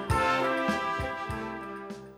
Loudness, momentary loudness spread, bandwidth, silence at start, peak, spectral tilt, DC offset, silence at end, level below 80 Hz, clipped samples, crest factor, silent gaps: -30 LUFS; 13 LU; 16.5 kHz; 0 s; -14 dBFS; -5.5 dB/octave; under 0.1%; 0 s; -46 dBFS; under 0.1%; 16 dB; none